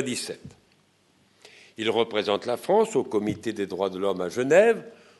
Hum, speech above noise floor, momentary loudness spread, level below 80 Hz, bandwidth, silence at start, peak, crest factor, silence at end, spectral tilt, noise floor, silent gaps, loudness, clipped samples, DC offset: none; 39 dB; 12 LU; -68 dBFS; 12 kHz; 0 s; -6 dBFS; 20 dB; 0.25 s; -4.5 dB/octave; -63 dBFS; none; -25 LUFS; under 0.1%; under 0.1%